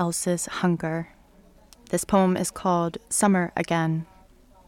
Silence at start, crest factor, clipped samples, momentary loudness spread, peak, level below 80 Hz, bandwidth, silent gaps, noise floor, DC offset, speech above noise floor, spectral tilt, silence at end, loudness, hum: 0 s; 18 dB; under 0.1%; 10 LU; -8 dBFS; -54 dBFS; 16.5 kHz; none; -54 dBFS; under 0.1%; 30 dB; -5 dB/octave; 0.65 s; -25 LUFS; none